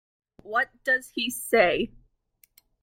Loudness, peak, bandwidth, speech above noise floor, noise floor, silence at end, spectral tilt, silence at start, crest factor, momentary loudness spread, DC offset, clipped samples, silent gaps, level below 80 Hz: -25 LUFS; -8 dBFS; 16.5 kHz; 40 dB; -65 dBFS; 0.95 s; -2.5 dB/octave; 0.45 s; 20 dB; 8 LU; under 0.1%; under 0.1%; none; -58 dBFS